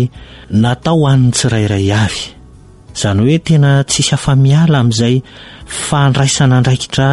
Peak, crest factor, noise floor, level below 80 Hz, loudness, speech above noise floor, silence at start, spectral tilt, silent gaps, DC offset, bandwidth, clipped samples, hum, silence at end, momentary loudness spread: 0 dBFS; 10 dB; -38 dBFS; -38 dBFS; -12 LUFS; 27 dB; 0 s; -5.5 dB/octave; none; 0.4%; 11.5 kHz; under 0.1%; none; 0 s; 9 LU